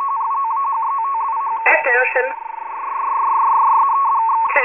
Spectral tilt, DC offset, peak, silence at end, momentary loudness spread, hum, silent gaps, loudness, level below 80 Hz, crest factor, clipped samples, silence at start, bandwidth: -4.5 dB/octave; 0.1%; -2 dBFS; 0 s; 10 LU; none; none; -17 LUFS; -72 dBFS; 14 dB; under 0.1%; 0 s; 3.5 kHz